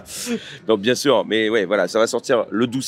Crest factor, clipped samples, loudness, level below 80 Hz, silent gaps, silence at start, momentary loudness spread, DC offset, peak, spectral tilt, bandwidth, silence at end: 16 dB; under 0.1%; -19 LUFS; -66 dBFS; none; 0 s; 9 LU; under 0.1%; -2 dBFS; -4 dB/octave; 16 kHz; 0 s